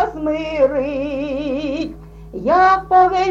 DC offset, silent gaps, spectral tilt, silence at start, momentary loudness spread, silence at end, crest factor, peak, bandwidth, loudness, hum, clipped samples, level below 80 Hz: under 0.1%; none; -6 dB/octave; 0 s; 12 LU; 0 s; 14 dB; -4 dBFS; 7.6 kHz; -17 LUFS; none; under 0.1%; -40 dBFS